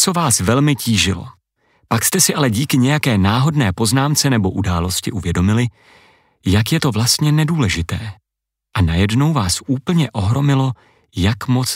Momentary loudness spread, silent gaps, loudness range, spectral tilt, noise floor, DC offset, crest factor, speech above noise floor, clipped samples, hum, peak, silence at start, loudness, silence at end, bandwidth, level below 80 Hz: 8 LU; none; 3 LU; -4.5 dB/octave; -82 dBFS; under 0.1%; 16 dB; 66 dB; under 0.1%; none; -2 dBFS; 0 s; -16 LUFS; 0 s; 16.5 kHz; -38 dBFS